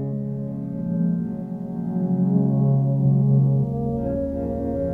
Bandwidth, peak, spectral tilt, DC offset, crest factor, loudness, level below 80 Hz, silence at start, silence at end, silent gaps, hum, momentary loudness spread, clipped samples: 1.9 kHz; -8 dBFS; -13 dB/octave; under 0.1%; 14 dB; -23 LUFS; -42 dBFS; 0 s; 0 s; none; none; 10 LU; under 0.1%